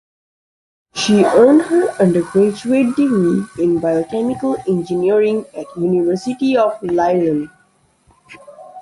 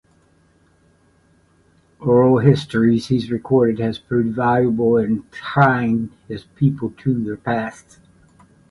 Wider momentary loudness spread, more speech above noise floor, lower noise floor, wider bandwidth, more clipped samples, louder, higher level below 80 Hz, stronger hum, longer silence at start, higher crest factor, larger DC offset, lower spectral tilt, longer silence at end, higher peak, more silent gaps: about the same, 9 LU vs 9 LU; about the same, 42 dB vs 39 dB; about the same, -57 dBFS vs -57 dBFS; about the same, 11.5 kHz vs 11.5 kHz; neither; first, -15 LUFS vs -18 LUFS; about the same, -54 dBFS vs -52 dBFS; neither; second, 0.95 s vs 2 s; about the same, 16 dB vs 18 dB; neither; second, -6.5 dB/octave vs -8.5 dB/octave; second, 0 s vs 1 s; about the same, 0 dBFS vs 0 dBFS; neither